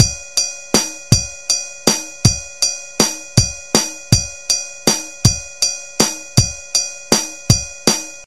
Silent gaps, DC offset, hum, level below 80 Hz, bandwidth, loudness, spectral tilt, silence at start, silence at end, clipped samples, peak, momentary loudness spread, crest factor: none; 0.8%; none; -34 dBFS; 17 kHz; -16 LUFS; -3 dB/octave; 0 s; 0 s; under 0.1%; 0 dBFS; 3 LU; 18 dB